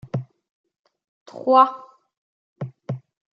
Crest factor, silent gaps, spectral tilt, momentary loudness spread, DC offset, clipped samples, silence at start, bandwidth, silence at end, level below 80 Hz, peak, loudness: 22 dB; 0.49-0.64 s, 0.79-0.84 s, 1.08-1.26 s, 2.17-2.56 s; -8.5 dB/octave; 22 LU; under 0.1%; under 0.1%; 0.15 s; 7 kHz; 0.35 s; -70 dBFS; -2 dBFS; -20 LUFS